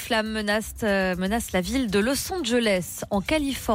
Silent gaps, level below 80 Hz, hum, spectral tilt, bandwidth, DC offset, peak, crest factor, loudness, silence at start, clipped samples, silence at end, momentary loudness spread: none; -42 dBFS; none; -4 dB/octave; 16.5 kHz; under 0.1%; -12 dBFS; 12 dB; -25 LUFS; 0 s; under 0.1%; 0 s; 3 LU